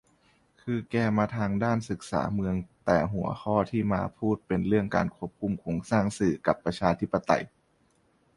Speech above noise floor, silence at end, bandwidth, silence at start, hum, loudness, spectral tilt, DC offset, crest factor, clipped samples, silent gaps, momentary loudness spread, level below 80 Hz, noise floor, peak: 40 dB; 0.9 s; 11.5 kHz; 0.65 s; none; -28 LUFS; -7 dB/octave; under 0.1%; 22 dB; under 0.1%; none; 7 LU; -52 dBFS; -67 dBFS; -6 dBFS